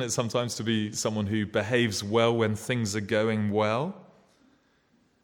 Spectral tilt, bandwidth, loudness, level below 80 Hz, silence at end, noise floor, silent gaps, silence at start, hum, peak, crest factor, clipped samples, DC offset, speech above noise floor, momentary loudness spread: -4.5 dB/octave; 17.5 kHz; -27 LUFS; -66 dBFS; 1.2 s; -66 dBFS; none; 0 s; none; -10 dBFS; 18 dB; under 0.1%; under 0.1%; 40 dB; 4 LU